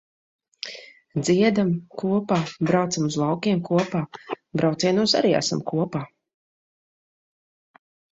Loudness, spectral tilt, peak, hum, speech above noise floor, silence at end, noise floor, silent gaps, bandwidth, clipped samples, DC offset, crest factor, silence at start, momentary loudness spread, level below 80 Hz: -23 LUFS; -5.5 dB/octave; -6 dBFS; none; 20 dB; 2.15 s; -42 dBFS; none; 8.2 kHz; under 0.1%; under 0.1%; 18 dB; 0.65 s; 16 LU; -62 dBFS